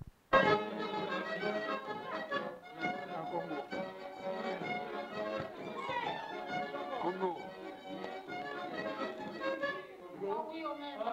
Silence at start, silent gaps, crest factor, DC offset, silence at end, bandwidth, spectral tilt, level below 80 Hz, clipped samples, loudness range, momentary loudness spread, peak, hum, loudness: 0 s; none; 24 dB; under 0.1%; 0 s; 16 kHz; -5.5 dB/octave; -68 dBFS; under 0.1%; 4 LU; 9 LU; -14 dBFS; none; -38 LUFS